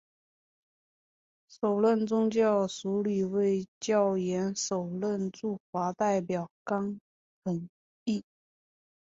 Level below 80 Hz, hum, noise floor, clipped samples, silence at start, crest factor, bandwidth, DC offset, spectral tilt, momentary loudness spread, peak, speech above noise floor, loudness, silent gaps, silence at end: -72 dBFS; none; under -90 dBFS; under 0.1%; 1.5 s; 16 dB; 8 kHz; under 0.1%; -6 dB/octave; 10 LU; -14 dBFS; over 61 dB; -30 LUFS; 3.68-3.81 s, 5.60-5.73 s, 6.51-6.65 s, 7.01-7.42 s, 7.69-8.06 s; 0.8 s